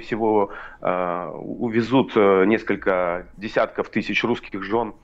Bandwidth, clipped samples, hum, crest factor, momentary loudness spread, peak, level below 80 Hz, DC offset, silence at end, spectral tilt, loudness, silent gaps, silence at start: 7.8 kHz; under 0.1%; none; 16 dB; 11 LU; -6 dBFS; -50 dBFS; under 0.1%; 0.1 s; -7 dB/octave; -22 LUFS; none; 0 s